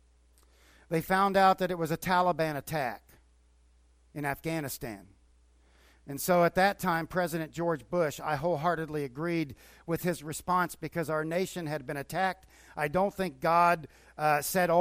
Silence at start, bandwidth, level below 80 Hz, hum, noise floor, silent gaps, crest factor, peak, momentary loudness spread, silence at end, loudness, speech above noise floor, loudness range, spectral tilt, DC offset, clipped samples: 0.9 s; 16 kHz; -58 dBFS; none; -63 dBFS; none; 20 dB; -10 dBFS; 12 LU; 0 s; -30 LUFS; 34 dB; 6 LU; -5 dB/octave; under 0.1%; under 0.1%